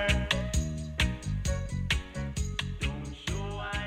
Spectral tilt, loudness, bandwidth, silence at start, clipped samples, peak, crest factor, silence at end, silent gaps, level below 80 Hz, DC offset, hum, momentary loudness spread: -4.5 dB/octave; -32 LUFS; 15.5 kHz; 0 s; under 0.1%; -10 dBFS; 20 dB; 0 s; none; -36 dBFS; under 0.1%; none; 6 LU